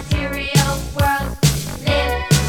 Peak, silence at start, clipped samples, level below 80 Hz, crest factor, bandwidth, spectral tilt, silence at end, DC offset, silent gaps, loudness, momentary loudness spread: 0 dBFS; 0 s; under 0.1%; -28 dBFS; 18 dB; 19 kHz; -4.5 dB/octave; 0 s; under 0.1%; none; -18 LUFS; 4 LU